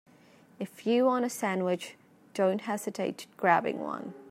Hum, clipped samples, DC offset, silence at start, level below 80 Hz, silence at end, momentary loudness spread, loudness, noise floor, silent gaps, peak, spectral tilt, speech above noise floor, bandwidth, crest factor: none; under 0.1%; under 0.1%; 0.6 s; -84 dBFS; 0 s; 15 LU; -30 LUFS; -58 dBFS; none; -8 dBFS; -5 dB/octave; 29 dB; 16 kHz; 22 dB